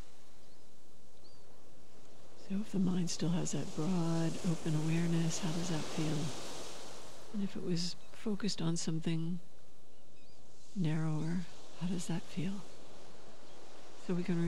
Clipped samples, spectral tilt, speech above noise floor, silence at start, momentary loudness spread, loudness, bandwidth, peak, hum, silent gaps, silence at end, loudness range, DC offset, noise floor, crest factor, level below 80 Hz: under 0.1%; -5.5 dB/octave; 28 dB; 1.25 s; 21 LU; -37 LUFS; 13.5 kHz; -22 dBFS; none; none; 0 s; 5 LU; 2%; -64 dBFS; 14 dB; -70 dBFS